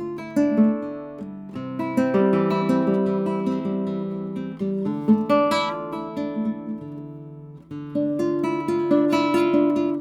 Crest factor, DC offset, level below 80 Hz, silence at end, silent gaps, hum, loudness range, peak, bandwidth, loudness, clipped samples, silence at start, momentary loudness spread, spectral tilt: 16 dB; under 0.1%; -64 dBFS; 0 s; none; none; 3 LU; -6 dBFS; 13 kHz; -23 LUFS; under 0.1%; 0 s; 16 LU; -7.5 dB/octave